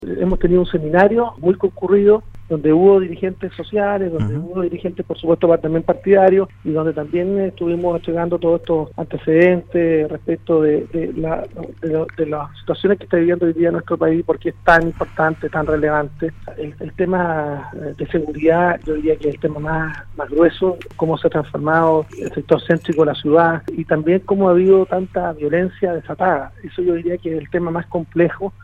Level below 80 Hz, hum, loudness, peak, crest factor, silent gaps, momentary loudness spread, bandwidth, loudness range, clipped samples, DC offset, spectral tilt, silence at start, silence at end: -38 dBFS; none; -17 LUFS; 0 dBFS; 16 dB; none; 10 LU; 7.2 kHz; 4 LU; under 0.1%; under 0.1%; -9 dB/octave; 0 s; 0.1 s